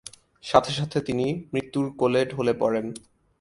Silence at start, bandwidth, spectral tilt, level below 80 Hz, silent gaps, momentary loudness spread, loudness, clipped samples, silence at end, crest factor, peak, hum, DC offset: 0.45 s; 11.5 kHz; -6 dB/octave; -56 dBFS; none; 15 LU; -25 LUFS; under 0.1%; 0.4 s; 24 dB; -2 dBFS; none; under 0.1%